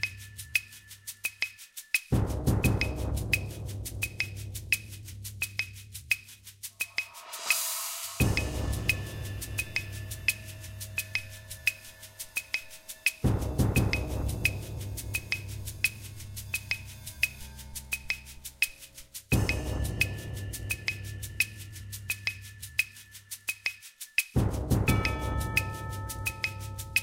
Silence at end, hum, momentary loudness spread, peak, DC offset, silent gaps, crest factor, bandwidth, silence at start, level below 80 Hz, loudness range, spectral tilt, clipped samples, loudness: 0 s; none; 15 LU; -8 dBFS; under 0.1%; none; 26 dB; 17 kHz; 0 s; -40 dBFS; 3 LU; -4 dB/octave; under 0.1%; -31 LUFS